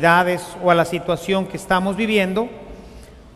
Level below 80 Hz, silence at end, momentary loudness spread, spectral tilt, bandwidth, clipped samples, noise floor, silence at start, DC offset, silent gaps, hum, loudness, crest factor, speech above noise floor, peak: -46 dBFS; 0.05 s; 15 LU; -5.5 dB/octave; 15 kHz; under 0.1%; -41 dBFS; 0 s; under 0.1%; none; none; -19 LUFS; 18 dB; 22 dB; -2 dBFS